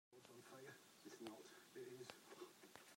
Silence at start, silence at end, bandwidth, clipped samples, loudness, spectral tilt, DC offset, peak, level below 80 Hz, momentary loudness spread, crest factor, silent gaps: 0.1 s; 0 s; 16 kHz; under 0.1%; -60 LUFS; -3.5 dB/octave; under 0.1%; -34 dBFS; under -90 dBFS; 6 LU; 26 dB; none